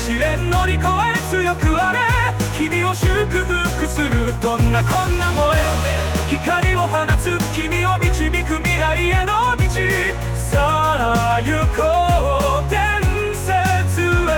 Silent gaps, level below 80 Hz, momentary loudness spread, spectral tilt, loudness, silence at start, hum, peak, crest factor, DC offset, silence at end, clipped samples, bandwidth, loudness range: none; -24 dBFS; 3 LU; -5 dB/octave; -18 LUFS; 0 s; none; -6 dBFS; 12 dB; under 0.1%; 0 s; under 0.1%; 19.5 kHz; 1 LU